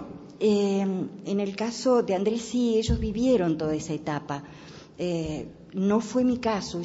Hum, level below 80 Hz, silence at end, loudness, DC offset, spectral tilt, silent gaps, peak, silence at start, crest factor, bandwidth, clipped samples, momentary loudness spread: none; -44 dBFS; 0 s; -26 LUFS; under 0.1%; -6 dB/octave; none; -12 dBFS; 0 s; 14 dB; 8 kHz; under 0.1%; 13 LU